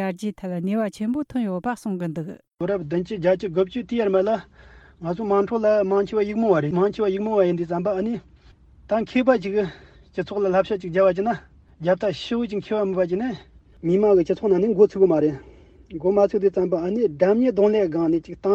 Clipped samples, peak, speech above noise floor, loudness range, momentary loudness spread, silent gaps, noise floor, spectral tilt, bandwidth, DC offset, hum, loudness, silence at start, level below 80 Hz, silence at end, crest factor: under 0.1%; -4 dBFS; 30 dB; 4 LU; 10 LU; none; -51 dBFS; -8 dB/octave; 9.8 kHz; under 0.1%; none; -22 LUFS; 0 s; -54 dBFS; 0 s; 18 dB